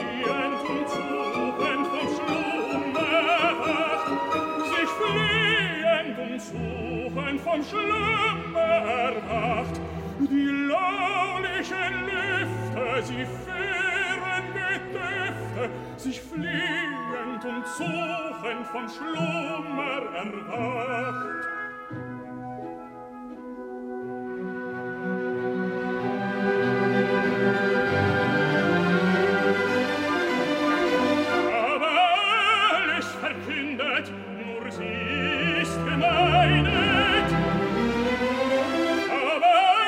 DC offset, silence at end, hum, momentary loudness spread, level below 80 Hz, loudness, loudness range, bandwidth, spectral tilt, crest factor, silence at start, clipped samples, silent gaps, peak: under 0.1%; 0 s; none; 12 LU; -50 dBFS; -25 LUFS; 9 LU; 16 kHz; -5.5 dB/octave; 16 dB; 0 s; under 0.1%; none; -8 dBFS